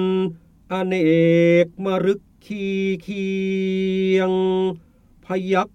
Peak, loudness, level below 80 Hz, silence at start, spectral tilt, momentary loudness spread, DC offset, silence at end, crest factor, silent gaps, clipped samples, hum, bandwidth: -6 dBFS; -20 LUFS; -56 dBFS; 0 s; -7.5 dB/octave; 12 LU; under 0.1%; 0.05 s; 14 dB; none; under 0.1%; none; 8.6 kHz